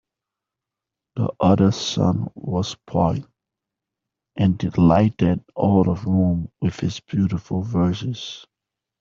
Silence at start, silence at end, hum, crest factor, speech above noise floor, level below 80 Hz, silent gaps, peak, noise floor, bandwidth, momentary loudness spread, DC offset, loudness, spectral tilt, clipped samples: 1.15 s; 0.6 s; none; 18 dB; 66 dB; -48 dBFS; none; -4 dBFS; -86 dBFS; 7.4 kHz; 11 LU; under 0.1%; -21 LUFS; -7.5 dB/octave; under 0.1%